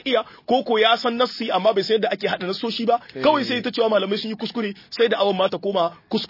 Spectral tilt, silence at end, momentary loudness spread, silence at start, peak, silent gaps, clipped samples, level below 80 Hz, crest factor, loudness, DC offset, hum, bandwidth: -5.5 dB/octave; 0.05 s; 7 LU; 0.05 s; -4 dBFS; none; under 0.1%; -66 dBFS; 18 dB; -21 LUFS; under 0.1%; none; 5.8 kHz